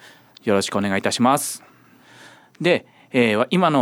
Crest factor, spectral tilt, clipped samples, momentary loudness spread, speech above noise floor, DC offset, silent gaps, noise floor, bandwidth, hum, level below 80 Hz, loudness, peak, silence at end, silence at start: 16 dB; -4.5 dB/octave; under 0.1%; 8 LU; 31 dB; under 0.1%; none; -50 dBFS; 19 kHz; none; -66 dBFS; -20 LUFS; -4 dBFS; 0 s; 0.45 s